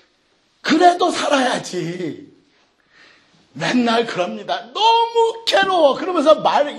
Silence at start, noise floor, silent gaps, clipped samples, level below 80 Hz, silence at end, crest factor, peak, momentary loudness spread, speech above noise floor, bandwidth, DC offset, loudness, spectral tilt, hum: 0.65 s; -61 dBFS; none; under 0.1%; -66 dBFS; 0 s; 18 dB; 0 dBFS; 12 LU; 44 dB; 12.5 kHz; under 0.1%; -17 LUFS; -3.5 dB/octave; none